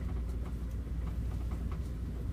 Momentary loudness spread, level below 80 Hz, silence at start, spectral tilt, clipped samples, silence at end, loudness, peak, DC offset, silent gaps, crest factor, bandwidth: 2 LU; -38 dBFS; 0 s; -8 dB/octave; under 0.1%; 0 s; -39 LUFS; -24 dBFS; under 0.1%; none; 12 dB; 11.5 kHz